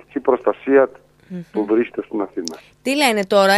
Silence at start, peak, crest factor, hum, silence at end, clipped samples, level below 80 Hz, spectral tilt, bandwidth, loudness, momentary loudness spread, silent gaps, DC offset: 0.15 s; -2 dBFS; 16 dB; none; 0 s; under 0.1%; -62 dBFS; -4 dB/octave; 14.5 kHz; -19 LUFS; 13 LU; none; under 0.1%